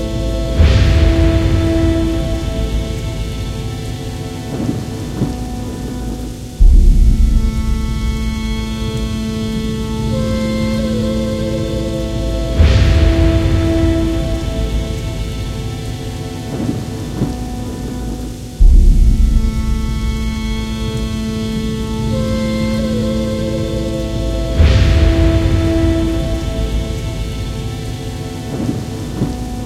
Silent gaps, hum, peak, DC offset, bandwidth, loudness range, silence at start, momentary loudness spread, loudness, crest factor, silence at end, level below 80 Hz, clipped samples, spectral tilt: none; none; 0 dBFS; under 0.1%; 14.5 kHz; 7 LU; 0 s; 11 LU; -17 LUFS; 14 dB; 0 s; -16 dBFS; under 0.1%; -6.5 dB/octave